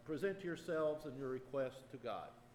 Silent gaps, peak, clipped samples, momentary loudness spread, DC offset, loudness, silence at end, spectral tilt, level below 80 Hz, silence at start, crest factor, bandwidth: none; -28 dBFS; under 0.1%; 8 LU; under 0.1%; -44 LUFS; 0 s; -6.5 dB/octave; -72 dBFS; 0 s; 16 dB; 16.5 kHz